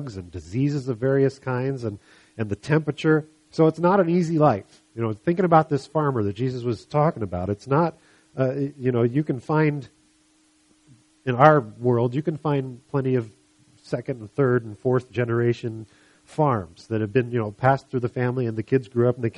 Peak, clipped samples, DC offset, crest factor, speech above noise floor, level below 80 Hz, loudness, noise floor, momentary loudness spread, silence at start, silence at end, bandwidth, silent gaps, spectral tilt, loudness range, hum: 0 dBFS; under 0.1%; under 0.1%; 24 dB; 39 dB; -58 dBFS; -23 LUFS; -61 dBFS; 12 LU; 0 s; 0 s; 11 kHz; none; -8.5 dB/octave; 4 LU; none